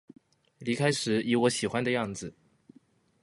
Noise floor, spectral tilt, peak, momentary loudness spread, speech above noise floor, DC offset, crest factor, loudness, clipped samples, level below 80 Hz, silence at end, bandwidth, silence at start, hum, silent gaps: -63 dBFS; -4.5 dB/octave; -12 dBFS; 13 LU; 35 dB; under 0.1%; 20 dB; -28 LUFS; under 0.1%; -66 dBFS; 0.9 s; 11.5 kHz; 0.6 s; none; none